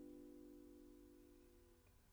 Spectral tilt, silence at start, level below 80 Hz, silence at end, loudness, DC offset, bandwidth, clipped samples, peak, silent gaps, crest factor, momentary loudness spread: -6 dB/octave; 0 s; -74 dBFS; 0 s; -64 LUFS; under 0.1%; over 20 kHz; under 0.1%; -50 dBFS; none; 14 dB; 8 LU